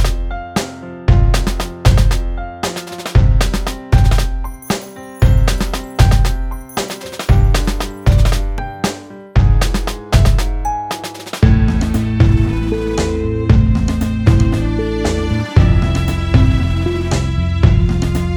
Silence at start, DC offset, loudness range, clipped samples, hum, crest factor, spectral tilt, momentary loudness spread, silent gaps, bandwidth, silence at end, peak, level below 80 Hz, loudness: 0 s; under 0.1%; 2 LU; under 0.1%; none; 14 dB; -6 dB/octave; 10 LU; none; 17 kHz; 0 s; 0 dBFS; -16 dBFS; -16 LUFS